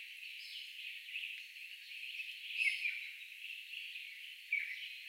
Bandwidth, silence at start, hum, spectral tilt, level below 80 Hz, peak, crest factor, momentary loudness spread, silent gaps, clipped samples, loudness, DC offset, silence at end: 16 kHz; 0 s; none; 8.5 dB/octave; under -90 dBFS; -20 dBFS; 24 dB; 12 LU; none; under 0.1%; -41 LUFS; under 0.1%; 0 s